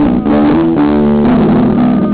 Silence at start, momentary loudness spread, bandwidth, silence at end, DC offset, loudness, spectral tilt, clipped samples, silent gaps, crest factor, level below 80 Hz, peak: 0 s; 1 LU; 4 kHz; 0 s; under 0.1%; -9 LUFS; -12.5 dB/octave; under 0.1%; none; 4 dB; -28 dBFS; -4 dBFS